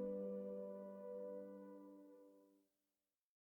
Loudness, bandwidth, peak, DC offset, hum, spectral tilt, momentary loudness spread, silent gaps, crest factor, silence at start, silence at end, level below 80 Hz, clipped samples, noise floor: -52 LUFS; 19.5 kHz; -36 dBFS; under 0.1%; none; -10 dB/octave; 17 LU; none; 16 dB; 0 s; 0.85 s; -90 dBFS; under 0.1%; under -90 dBFS